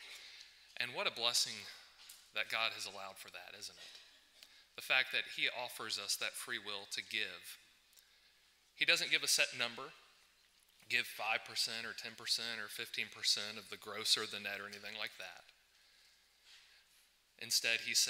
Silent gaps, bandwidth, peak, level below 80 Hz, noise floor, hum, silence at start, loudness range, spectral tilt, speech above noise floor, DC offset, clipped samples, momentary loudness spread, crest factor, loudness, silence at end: none; 16 kHz; -14 dBFS; -86 dBFS; -71 dBFS; none; 0 s; 6 LU; 0.5 dB/octave; 31 dB; under 0.1%; under 0.1%; 20 LU; 26 dB; -37 LUFS; 0 s